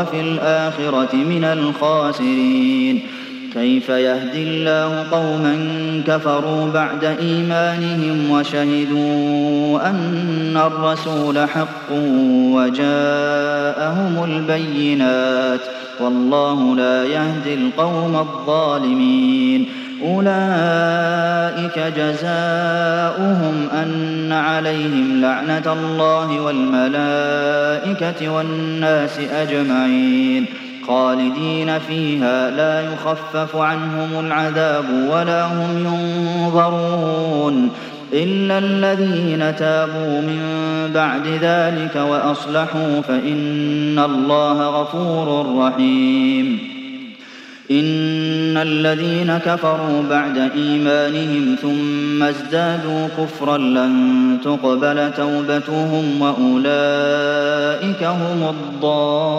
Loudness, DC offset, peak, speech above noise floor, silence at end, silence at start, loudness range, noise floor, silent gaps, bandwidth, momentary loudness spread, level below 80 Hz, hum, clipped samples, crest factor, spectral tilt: -17 LUFS; under 0.1%; -2 dBFS; 21 dB; 0 s; 0 s; 2 LU; -38 dBFS; none; 8.2 kHz; 5 LU; -72 dBFS; none; under 0.1%; 14 dB; -6.5 dB/octave